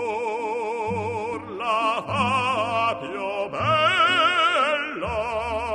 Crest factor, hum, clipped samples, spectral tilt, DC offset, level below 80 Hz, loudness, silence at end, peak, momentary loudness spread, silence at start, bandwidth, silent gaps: 14 dB; none; under 0.1%; -4 dB/octave; under 0.1%; -50 dBFS; -23 LUFS; 0 s; -8 dBFS; 10 LU; 0 s; 12.5 kHz; none